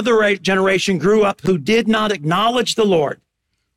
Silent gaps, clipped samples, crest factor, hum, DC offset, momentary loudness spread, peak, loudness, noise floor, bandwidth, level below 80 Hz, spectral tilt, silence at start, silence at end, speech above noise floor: none; under 0.1%; 10 dB; none; under 0.1%; 3 LU; -8 dBFS; -16 LUFS; -72 dBFS; 15 kHz; -52 dBFS; -5 dB/octave; 0 s; 0.65 s; 56 dB